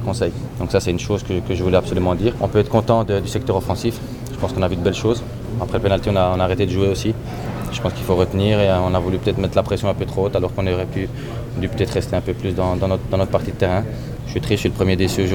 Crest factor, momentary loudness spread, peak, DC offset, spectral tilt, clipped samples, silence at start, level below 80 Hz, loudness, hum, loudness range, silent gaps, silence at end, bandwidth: 18 dB; 9 LU; -2 dBFS; under 0.1%; -6.5 dB/octave; under 0.1%; 0 s; -34 dBFS; -20 LUFS; none; 2 LU; none; 0 s; 18.5 kHz